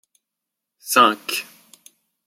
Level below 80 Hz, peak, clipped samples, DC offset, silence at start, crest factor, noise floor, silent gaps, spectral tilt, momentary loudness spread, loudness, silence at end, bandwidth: -78 dBFS; -2 dBFS; under 0.1%; under 0.1%; 0.85 s; 22 dB; -83 dBFS; none; -1.5 dB/octave; 24 LU; -18 LUFS; 0.85 s; 16.5 kHz